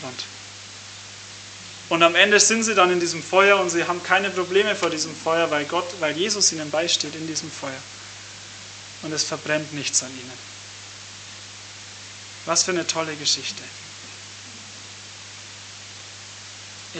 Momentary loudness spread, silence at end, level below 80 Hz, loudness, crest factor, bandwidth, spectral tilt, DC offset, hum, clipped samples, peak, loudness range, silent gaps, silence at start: 21 LU; 0 s; -70 dBFS; -20 LUFS; 24 dB; 9.4 kHz; -1.5 dB/octave; under 0.1%; 50 Hz at -50 dBFS; under 0.1%; 0 dBFS; 10 LU; none; 0 s